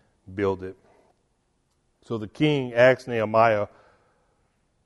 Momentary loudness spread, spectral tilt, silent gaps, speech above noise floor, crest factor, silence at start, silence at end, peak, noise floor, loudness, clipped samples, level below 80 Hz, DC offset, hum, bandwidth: 16 LU; -7 dB/octave; none; 48 dB; 20 dB; 0.3 s; 1.2 s; -4 dBFS; -70 dBFS; -23 LUFS; under 0.1%; -64 dBFS; under 0.1%; none; 11.5 kHz